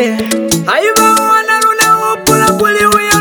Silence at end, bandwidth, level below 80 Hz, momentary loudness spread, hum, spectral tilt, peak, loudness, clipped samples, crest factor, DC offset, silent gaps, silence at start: 0 s; over 20 kHz; -40 dBFS; 5 LU; none; -3 dB/octave; 0 dBFS; -9 LUFS; under 0.1%; 10 dB; under 0.1%; none; 0 s